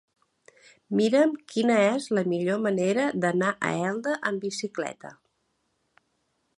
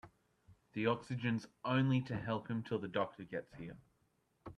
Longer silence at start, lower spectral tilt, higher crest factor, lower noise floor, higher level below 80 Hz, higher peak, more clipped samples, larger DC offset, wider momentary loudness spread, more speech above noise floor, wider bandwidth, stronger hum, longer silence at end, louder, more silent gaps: first, 0.9 s vs 0.05 s; second, -5.5 dB/octave vs -7.5 dB/octave; about the same, 18 dB vs 20 dB; second, -74 dBFS vs -78 dBFS; about the same, -74 dBFS vs -72 dBFS; first, -8 dBFS vs -20 dBFS; neither; neither; second, 10 LU vs 16 LU; first, 49 dB vs 40 dB; first, 11.5 kHz vs 9.6 kHz; neither; first, 1.45 s vs 0.05 s; first, -26 LUFS vs -38 LUFS; neither